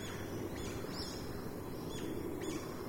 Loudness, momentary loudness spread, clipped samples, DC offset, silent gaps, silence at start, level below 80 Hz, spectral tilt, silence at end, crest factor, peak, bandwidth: -42 LUFS; 3 LU; under 0.1%; under 0.1%; none; 0 s; -56 dBFS; -5 dB/octave; 0 s; 14 dB; -28 dBFS; 16 kHz